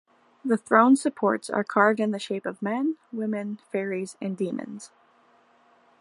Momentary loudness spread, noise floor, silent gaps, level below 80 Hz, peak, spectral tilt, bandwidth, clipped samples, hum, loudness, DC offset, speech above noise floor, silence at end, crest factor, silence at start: 13 LU; -60 dBFS; none; -78 dBFS; -4 dBFS; -5.5 dB/octave; 11.5 kHz; under 0.1%; none; -25 LUFS; under 0.1%; 36 dB; 1.15 s; 22 dB; 0.45 s